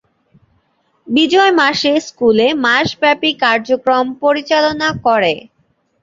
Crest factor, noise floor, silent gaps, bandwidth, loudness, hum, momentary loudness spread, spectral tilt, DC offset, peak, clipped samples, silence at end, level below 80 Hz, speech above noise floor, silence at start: 14 dB; -61 dBFS; none; 7.8 kHz; -13 LUFS; none; 5 LU; -4 dB/octave; under 0.1%; 0 dBFS; under 0.1%; 0.65 s; -52 dBFS; 47 dB; 1.05 s